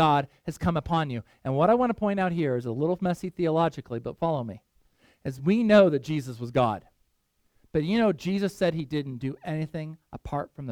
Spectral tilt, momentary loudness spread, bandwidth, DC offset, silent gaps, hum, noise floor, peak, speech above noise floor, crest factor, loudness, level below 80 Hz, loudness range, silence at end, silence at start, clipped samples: -7.5 dB/octave; 13 LU; 15.5 kHz; under 0.1%; none; none; -71 dBFS; -6 dBFS; 46 dB; 20 dB; -26 LUFS; -52 dBFS; 4 LU; 0 s; 0 s; under 0.1%